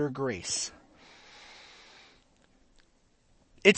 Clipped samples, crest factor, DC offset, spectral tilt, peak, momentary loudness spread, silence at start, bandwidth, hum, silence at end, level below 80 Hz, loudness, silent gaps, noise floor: under 0.1%; 30 dB; under 0.1%; -3 dB/octave; -4 dBFS; 24 LU; 0 s; 8.8 kHz; none; 0 s; -66 dBFS; -30 LUFS; none; -66 dBFS